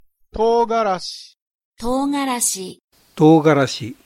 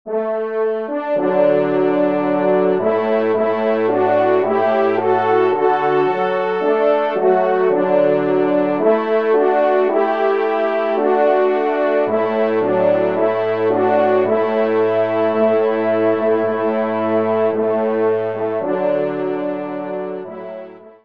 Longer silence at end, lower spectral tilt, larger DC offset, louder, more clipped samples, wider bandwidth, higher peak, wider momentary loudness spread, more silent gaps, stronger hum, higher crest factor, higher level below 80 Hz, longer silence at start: about the same, 0.15 s vs 0.15 s; second, -5 dB/octave vs -8.5 dB/octave; second, under 0.1% vs 0.4%; about the same, -17 LUFS vs -17 LUFS; neither; first, 16.5 kHz vs 5.6 kHz; first, 0 dBFS vs -4 dBFS; first, 17 LU vs 6 LU; first, 1.41-1.46 s, 1.55-1.59 s, 1.65-1.72 s, 2.84-2.88 s vs none; neither; about the same, 18 dB vs 14 dB; first, -46 dBFS vs -70 dBFS; first, 0.35 s vs 0.05 s